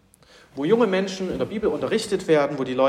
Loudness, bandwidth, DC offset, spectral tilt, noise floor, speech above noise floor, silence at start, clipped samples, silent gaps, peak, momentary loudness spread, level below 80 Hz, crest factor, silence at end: -23 LUFS; 13 kHz; under 0.1%; -5.5 dB/octave; -53 dBFS; 31 dB; 0.55 s; under 0.1%; none; -6 dBFS; 8 LU; -54 dBFS; 16 dB; 0 s